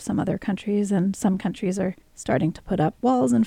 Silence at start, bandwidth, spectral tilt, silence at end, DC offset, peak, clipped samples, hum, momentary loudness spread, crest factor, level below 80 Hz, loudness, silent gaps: 0 s; 13.5 kHz; -7 dB/octave; 0 s; under 0.1%; -8 dBFS; under 0.1%; none; 6 LU; 14 dB; -50 dBFS; -24 LUFS; none